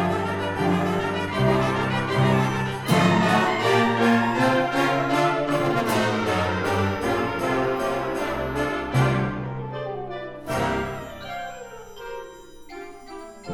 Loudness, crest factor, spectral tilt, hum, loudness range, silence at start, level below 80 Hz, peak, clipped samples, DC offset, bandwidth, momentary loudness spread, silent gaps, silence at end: -23 LUFS; 16 dB; -6 dB/octave; none; 10 LU; 0 s; -46 dBFS; -6 dBFS; under 0.1%; under 0.1%; 17.5 kHz; 17 LU; none; 0 s